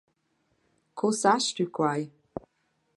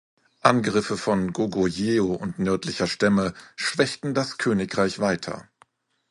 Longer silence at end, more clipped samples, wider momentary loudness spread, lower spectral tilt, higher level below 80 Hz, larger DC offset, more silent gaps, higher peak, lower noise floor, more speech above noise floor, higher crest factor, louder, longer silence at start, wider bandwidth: second, 0.55 s vs 0.7 s; neither; first, 19 LU vs 6 LU; about the same, -4 dB/octave vs -5 dB/octave; second, -68 dBFS vs -54 dBFS; neither; neither; second, -8 dBFS vs 0 dBFS; first, -74 dBFS vs -61 dBFS; first, 48 dB vs 37 dB; about the same, 22 dB vs 24 dB; second, -27 LUFS vs -24 LUFS; first, 0.95 s vs 0.45 s; about the same, 11.5 kHz vs 11.5 kHz